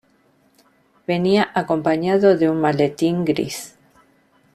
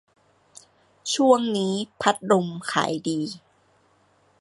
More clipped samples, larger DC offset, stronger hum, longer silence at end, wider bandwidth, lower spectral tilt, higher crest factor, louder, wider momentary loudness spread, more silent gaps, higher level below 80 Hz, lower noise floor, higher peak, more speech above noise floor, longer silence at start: neither; neither; neither; second, 0.85 s vs 1 s; first, 14.5 kHz vs 11.5 kHz; first, -6 dB/octave vs -4.5 dB/octave; about the same, 18 dB vs 22 dB; first, -19 LUFS vs -23 LUFS; about the same, 12 LU vs 12 LU; neither; first, -58 dBFS vs -70 dBFS; about the same, -59 dBFS vs -62 dBFS; about the same, -2 dBFS vs -4 dBFS; about the same, 41 dB vs 39 dB; about the same, 1.1 s vs 1.05 s